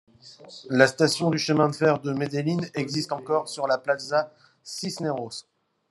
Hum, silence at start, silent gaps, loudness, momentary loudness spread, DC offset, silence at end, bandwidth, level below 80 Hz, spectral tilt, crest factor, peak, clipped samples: none; 0.25 s; none; -25 LUFS; 16 LU; under 0.1%; 0.5 s; 12.5 kHz; -70 dBFS; -5 dB/octave; 24 dB; -2 dBFS; under 0.1%